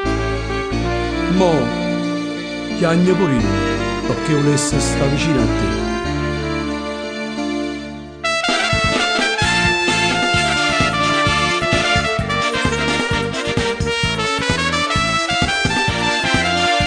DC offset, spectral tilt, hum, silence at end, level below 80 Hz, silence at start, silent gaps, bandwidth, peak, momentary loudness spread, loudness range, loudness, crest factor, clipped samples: under 0.1%; -4 dB/octave; none; 0 s; -32 dBFS; 0 s; none; 10 kHz; -2 dBFS; 7 LU; 4 LU; -17 LUFS; 16 dB; under 0.1%